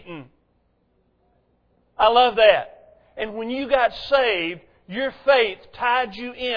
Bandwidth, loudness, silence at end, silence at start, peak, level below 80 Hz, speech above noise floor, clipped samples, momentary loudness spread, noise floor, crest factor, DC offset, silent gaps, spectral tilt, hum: 5.4 kHz; -20 LUFS; 0 s; 0.05 s; 0 dBFS; -52 dBFS; 45 dB; under 0.1%; 17 LU; -65 dBFS; 22 dB; under 0.1%; none; -5.5 dB/octave; none